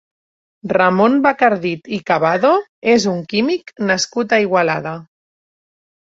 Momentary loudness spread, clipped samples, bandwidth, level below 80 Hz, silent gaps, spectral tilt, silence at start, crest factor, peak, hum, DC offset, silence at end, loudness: 9 LU; under 0.1%; 7.8 kHz; -60 dBFS; 2.69-2.82 s; -5 dB/octave; 0.65 s; 16 dB; -2 dBFS; none; under 0.1%; 1 s; -16 LUFS